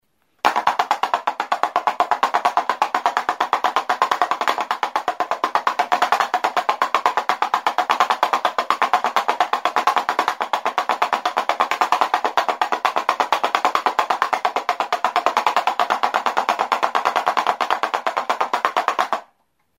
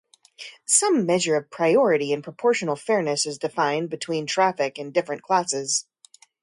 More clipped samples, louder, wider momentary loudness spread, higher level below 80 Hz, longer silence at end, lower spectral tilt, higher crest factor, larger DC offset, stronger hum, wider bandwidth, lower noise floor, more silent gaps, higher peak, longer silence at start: neither; first, -20 LUFS vs -23 LUFS; second, 4 LU vs 9 LU; about the same, -72 dBFS vs -74 dBFS; about the same, 0.55 s vs 0.6 s; second, -1 dB/octave vs -3 dB/octave; about the same, 20 dB vs 18 dB; neither; neither; first, 16 kHz vs 11.5 kHz; first, -64 dBFS vs -55 dBFS; neither; first, 0 dBFS vs -6 dBFS; about the same, 0.45 s vs 0.4 s